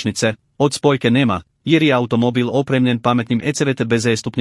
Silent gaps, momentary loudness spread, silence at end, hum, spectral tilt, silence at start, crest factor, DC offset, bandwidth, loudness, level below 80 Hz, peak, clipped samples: none; 5 LU; 0 s; none; -5.5 dB/octave; 0 s; 16 dB; under 0.1%; 12 kHz; -17 LUFS; -56 dBFS; 0 dBFS; under 0.1%